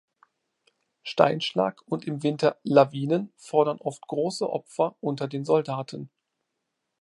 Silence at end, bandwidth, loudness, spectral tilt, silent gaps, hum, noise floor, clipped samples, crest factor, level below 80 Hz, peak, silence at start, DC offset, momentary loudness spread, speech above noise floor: 0.95 s; 11.5 kHz; -26 LUFS; -6 dB/octave; none; none; -81 dBFS; under 0.1%; 24 dB; -76 dBFS; -2 dBFS; 1.05 s; under 0.1%; 12 LU; 56 dB